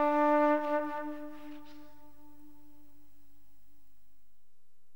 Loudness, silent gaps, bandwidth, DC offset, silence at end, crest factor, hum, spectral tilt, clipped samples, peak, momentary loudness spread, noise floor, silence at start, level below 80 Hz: -30 LUFS; none; 16.5 kHz; 0.7%; 3.1 s; 18 dB; 50 Hz at -70 dBFS; -6 dB/octave; under 0.1%; -18 dBFS; 24 LU; -80 dBFS; 0 s; -70 dBFS